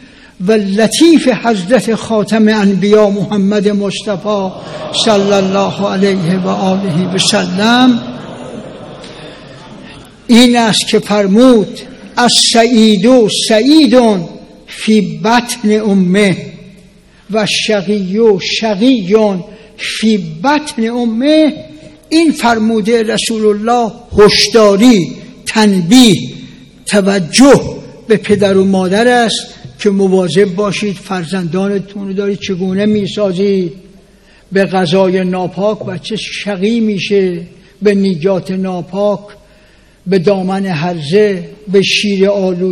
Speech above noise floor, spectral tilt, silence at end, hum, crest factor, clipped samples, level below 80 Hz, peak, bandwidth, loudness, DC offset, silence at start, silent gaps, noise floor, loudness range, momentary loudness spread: 34 dB; -5 dB/octave; 0 s; none; 12 dB; 1%; -44 dBFS; 0 dBFS; 15 kHz; -11 LUFS; under 0.1%; 0.4 s; none; -44 dBFS; 6 LU; 13 LU